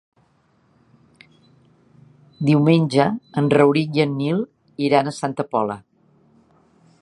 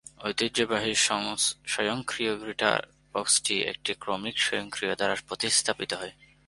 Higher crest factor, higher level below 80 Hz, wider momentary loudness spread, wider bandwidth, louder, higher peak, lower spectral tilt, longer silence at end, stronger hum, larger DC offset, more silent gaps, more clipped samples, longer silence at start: about the same, 20 dB vs 24 dB; about the same, -64 dBFS vs -62 dBFS; about the same, 10 LU vs 8 LU; about the same, 11 kHz vs 11.5 kHz; first, -19 LUFS vs -27 LUFS; first, 0 dBFS vs -6 dBFS; first, -7 dB/octave vs -1.5 dB/octave; first, 1.25 s vs 0.35 s; neither; neither; neither; neither; first, 2.4 s vs 0.2 s